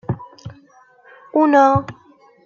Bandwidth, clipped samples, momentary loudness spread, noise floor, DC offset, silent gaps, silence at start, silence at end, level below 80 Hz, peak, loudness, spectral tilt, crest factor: 7.2 kHz; under 0.1%; 26 LU; -50 dBFS; under 0.1%; none; 0.1 s; 0.55 s; -54 dBFS; -2 dBFS; -16 LUFS; -8 dB/octave; 18 dB